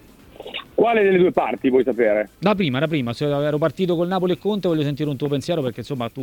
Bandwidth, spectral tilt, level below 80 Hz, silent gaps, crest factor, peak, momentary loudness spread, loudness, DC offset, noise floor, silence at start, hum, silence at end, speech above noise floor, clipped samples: 17.5 kHz; -7 dB/octave; -54 dBFS; none; 18 dB; -2 dBFS; 10 LU; -20 LUFS; under 0.1%; -40 dBFS; 0.4 s; none; 0 s; 20 dB; under 0.1%